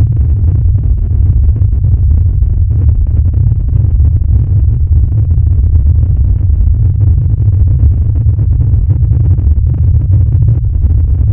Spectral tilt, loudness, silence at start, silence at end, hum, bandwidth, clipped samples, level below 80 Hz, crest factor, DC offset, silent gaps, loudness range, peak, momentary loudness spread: -14 dB/octave; -10 LUFS; 0 s; 0 s; none; 1.3 kHz; 0.3%; -10 dBFS; 8 dB; under 0.1%; none; 1 LU; 0 dBFS; 2 LU